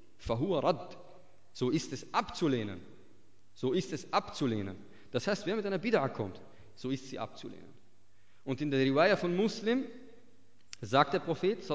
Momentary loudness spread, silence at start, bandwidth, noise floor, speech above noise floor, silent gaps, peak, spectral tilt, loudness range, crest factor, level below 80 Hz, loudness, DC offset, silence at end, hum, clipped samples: 19 LU; 0.2 s; 8 kHz; -69 dBFS; 37 dB; none; -12 dBFS; -6 dB/octave; 5 LU; 22 dB; -62 dBFS; -33 LUFS; 0.3%; 0 s; none; under 0.1%